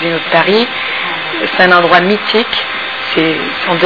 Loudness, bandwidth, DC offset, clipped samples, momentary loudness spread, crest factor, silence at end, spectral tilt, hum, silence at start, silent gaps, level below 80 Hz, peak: -11 LUFS; 5.4 kHz; 0.8%; 0.6%; 8 LU; 12 dB; 0 s; -6 dB/octave; none; 0 s; none; -50 dBFS; 0 dBFS